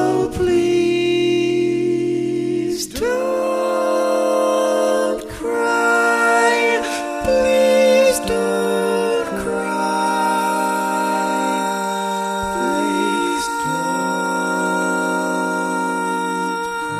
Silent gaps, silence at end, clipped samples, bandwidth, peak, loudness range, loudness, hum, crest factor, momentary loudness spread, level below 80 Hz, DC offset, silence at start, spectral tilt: none; 0 s; under 0.1%; 15.5 kHz; -4 dBFS; 4 LU; -18 LUFS; none; 14 dB; 7 LU; -46 dBFS; under 0.1%; 0 s; -4 dB/octave